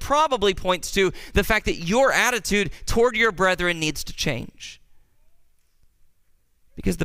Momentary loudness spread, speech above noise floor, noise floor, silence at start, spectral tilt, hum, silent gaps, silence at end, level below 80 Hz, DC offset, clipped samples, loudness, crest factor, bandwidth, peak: 10 LU; 39 dB; -60 dBFS; 0 s; -3.5 dB/octave; none; none; 0 s; -38 dBFS; under 0.1%; under 0.1%; -22 LUFS; 20 dB; 16 kHz; -4 dBFS